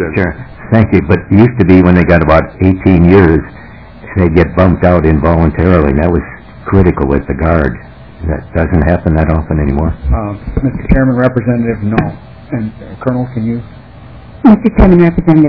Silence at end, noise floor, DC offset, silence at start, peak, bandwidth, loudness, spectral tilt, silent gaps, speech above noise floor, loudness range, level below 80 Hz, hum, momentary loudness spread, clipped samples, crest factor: 0 s; -32 dBFS; under 0.1%; 0 s; 0 dBFS; 5.4 kHz; -10 LUFS; -11 dB/octave; none; 23 dB; 6 LU; -20 dBFS; none; 13 LU; 3%; 10 dB